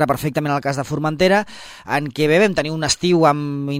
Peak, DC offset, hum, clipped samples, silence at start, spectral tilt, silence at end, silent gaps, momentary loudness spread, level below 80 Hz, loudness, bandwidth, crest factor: 0 dBFS; under 0.1%; none; under 0.1%; 0 s; -5 dB/octave; 0 s; none; 8 LU; -48 dBFS; -18 LUFS; 16 kHz; 18 dB